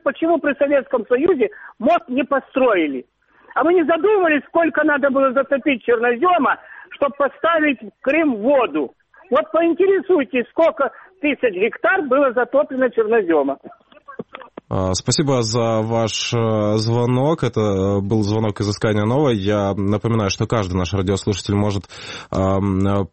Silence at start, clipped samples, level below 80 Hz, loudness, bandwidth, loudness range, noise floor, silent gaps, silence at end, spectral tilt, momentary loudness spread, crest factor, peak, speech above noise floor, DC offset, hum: 0.05 s; under 0.1%; -48 dBFS; -18 LUFS; 8.8 kHz; 3 LU; -39 dBFS; none; 0.05 s; -6 dB/octave; 7 LU; 14 dB; -6 dBFS; 21 dB; under 0.1%; none